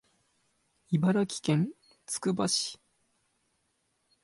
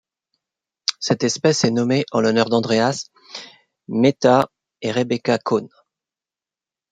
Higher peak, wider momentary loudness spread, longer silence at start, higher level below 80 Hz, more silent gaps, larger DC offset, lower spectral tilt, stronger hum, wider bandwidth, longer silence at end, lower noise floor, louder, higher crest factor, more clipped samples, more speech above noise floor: second, -16 dBFS vs 0 dBFS; second, 8 LU vs 13 LU; about the same, 0.9 s vs 0.9 s; second, -72 dBFS vs -64 dBFS; neither; neither; about the same, -5 dB/octave vs -5 dB/octave; neither; first, 11.5 kHz vs 9.4 kHz; first, 1.5 s vs 1.25 s; second, -76 dBFS vs under -90 dBFS; second, -30 LUFS vs -19 LUFS; about the same, 18 dB vs 20 dB; neither; second, 47 dB vs over 71 dB